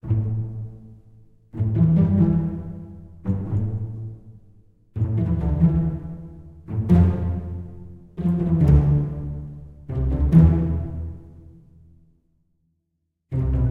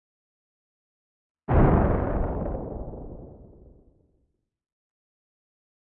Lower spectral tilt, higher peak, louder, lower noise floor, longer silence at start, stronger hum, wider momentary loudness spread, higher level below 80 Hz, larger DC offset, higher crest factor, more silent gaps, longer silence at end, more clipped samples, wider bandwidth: second, -11.5 dB/octave vs -13 dB/octave; first, -2 dBFS vs -6 dBFS; first, -22 LUFS vs -25 LUFS; about the same, -76 dBFS vs -73 dBFS; second, 0.05 s vs 1.5 s; neither; about the same, 21 LU vs 23 LU; about the same, -30 dBFS vs -34 dBFS; neither; about the same, 20 dB vs 22 dB; neither; second, 0 s vs 2.55 s; neither; about the same, 3.2 kHz vs 3.5 kHz